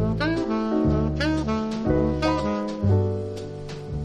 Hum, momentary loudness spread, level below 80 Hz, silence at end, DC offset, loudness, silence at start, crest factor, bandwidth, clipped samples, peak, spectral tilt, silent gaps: none; 11 LU; -36 dBFS; 0 s; under 0.1%; -24 LUFS; 0 s; 16 dB; 9.8 kHz; under 0.1%; -8 dBFS; -7.5 dB/octave; none